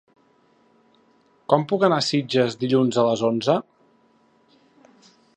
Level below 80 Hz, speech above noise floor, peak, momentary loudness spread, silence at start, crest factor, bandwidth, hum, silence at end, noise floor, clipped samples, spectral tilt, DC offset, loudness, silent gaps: -70 dBFS; 40 dB; -2 dBFS; 4 LU; 1.5 s; 22 dB; 9.8 kHz; none; 1.75 s; -60 dBFS; under 0.1%; -5.5 dB/octave; under 0.1%; -21 LUFS; none